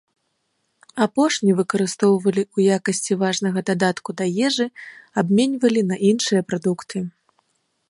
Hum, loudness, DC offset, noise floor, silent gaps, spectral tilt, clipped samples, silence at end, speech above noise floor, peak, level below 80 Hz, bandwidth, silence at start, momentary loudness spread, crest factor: none; -20 LUFS; under 0.1%; -71 dBFS; none; -5 dB/octave; under 0.1%; 0.8 s; 52 dB; -4 dBFS; -68 dBFS; 11.5 kHz; 0.95 s; 9 LU; 16 dB